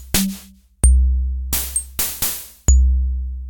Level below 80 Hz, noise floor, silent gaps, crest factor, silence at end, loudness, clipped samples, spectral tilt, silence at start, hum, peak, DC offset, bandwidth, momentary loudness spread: -18 dBFS; -41 dBFS; none; 16 dB; 0 s; -19 LUFS; under 0.1%; -3.5 dB/octave; 0 s; none; -2 dBFS; under 0.1%; 18 kHz; 8 LU